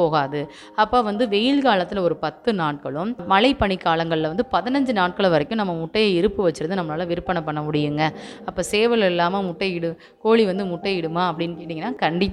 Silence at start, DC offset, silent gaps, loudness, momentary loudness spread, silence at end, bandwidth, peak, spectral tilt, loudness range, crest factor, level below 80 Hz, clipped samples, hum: 0 s; under 0.1%; none; -21 LUFS; 9 LU; 0 s; 13 kHz; -2 dBFS; -6 dB/octave; 2 LU; 18 dB; -48 dBFS; under 0.1%; none